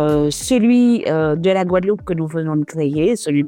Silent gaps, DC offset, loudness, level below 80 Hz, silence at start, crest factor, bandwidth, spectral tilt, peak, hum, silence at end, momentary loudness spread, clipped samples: none; under 0.1%; -17 LUFS; -44 dBFS; 0 s; 12 dB; 16.5 kHz; -6 dB/octave; -4 dBFS; none; 0 s; 7 LU; under 0.1%